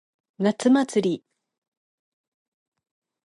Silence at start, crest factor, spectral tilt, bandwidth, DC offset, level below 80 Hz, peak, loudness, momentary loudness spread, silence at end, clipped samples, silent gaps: 0.4 s; 20 dB; -5.5 dB/octave; 11.5 kHz; under 0.1%; -78 dBFS; -6 dBFS; -22 LUFS; 8 LU; 2.1 s; under 0.1%; none